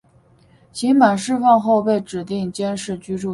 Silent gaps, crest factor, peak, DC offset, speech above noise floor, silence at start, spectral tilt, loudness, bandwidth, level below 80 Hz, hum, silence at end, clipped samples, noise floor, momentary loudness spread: none; 18 dB; 0 dBFS; under 0.1%; 36 dB; 0.75 s; -5.5 dB/octave; -18 LUFS; 11.5 kHz; -58 dBFS; none; 0 s; under 0.1%; -53 dBFS; 12 LU